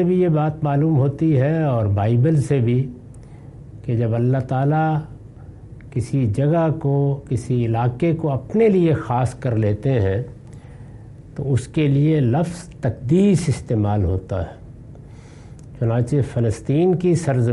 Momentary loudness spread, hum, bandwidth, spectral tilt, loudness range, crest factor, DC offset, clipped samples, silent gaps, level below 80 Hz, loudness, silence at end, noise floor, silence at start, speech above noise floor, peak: 22 LU; none; 11.5 kHz; -8.5 dB/octave; 3 LU; 12 dB; under 0.1%; under 0.1%; none; -44 dBFS; -20 LUFS; 0 s; -40 dBFS; 0 s; 21 dB; -6 dBFS